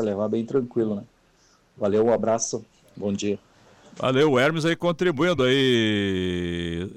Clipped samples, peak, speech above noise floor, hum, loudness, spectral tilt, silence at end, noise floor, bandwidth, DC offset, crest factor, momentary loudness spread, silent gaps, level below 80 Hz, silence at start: under 0.1%; -10 dBFS; 37 dB; none; -23 LUFS; -5 dB/octave; 0 s; -60 dBFS; 14 kHz; under 0.1%; 14 dB; 10 LU; none; -54 dBFS; 0 s